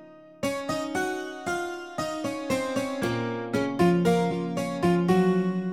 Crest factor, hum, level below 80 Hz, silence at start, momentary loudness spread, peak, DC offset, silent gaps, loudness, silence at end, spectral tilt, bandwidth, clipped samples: 16 dB; none; -58 dBFS; 0 s; 9 LU; -10 dBFS; 0.1%; none; -27 LUFS; 0 s; -6 dB/octave; 15.5 kHz; under 0.1%